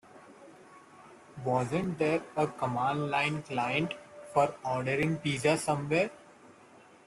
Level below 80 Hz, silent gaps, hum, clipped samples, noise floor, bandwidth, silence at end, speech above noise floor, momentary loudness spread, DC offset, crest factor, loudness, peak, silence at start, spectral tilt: -66 dBFS; none; none; under 0.1%; -57 dBFS; 12.5 kHz; 0.6 s; 27 dB; 5 LU; under 0.1%; 20 dB; -31 LUFS; -12 dBFS; 0.15 s; -5.5 dB/octave